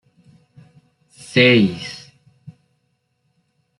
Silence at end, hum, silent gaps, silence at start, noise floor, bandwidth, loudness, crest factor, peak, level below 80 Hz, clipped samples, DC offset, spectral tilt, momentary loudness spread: 1.8 s; none; none; 1.35 s; -69 dBFS; 11.5 kHz; -15 LUFS; 20 dB; -2 dBFS; -62 dBFS; under 0.1%; under 0.1%; -6 dB/octave; 20 LU